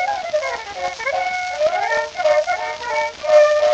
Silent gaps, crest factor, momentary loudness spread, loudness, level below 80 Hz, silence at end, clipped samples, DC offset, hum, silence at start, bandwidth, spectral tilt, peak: none; 16 dB; 10 LU; -19 LUFS; -56 dBFS; 0 s; under 0.1%; under 0.1%; none; 0 s; 8.4 kHz; -1 dB/octave; -2 dBFS